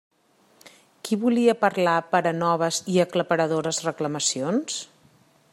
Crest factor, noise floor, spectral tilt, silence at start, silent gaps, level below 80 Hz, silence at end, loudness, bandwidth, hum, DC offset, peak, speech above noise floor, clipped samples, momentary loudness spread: 20 dB; -61 dBFS; -4 dB/octave; 0.65 s; none; -72 dBFS; 0.65 s; -23 LUFS; 16 kHz; none; under 0.1%; -6 dBFS; 38 dB; under 0.1%; 8 LU